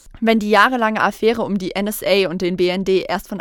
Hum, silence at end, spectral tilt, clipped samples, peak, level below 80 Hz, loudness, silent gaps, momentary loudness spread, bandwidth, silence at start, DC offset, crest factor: none; 0 s; -5 dB/octave; under 0.1%; 0 dBFS; -46 dBFS; -17 LUFS; none; 8 LU; 18 kHz; 0.05 s; under 0.1%; 18 dB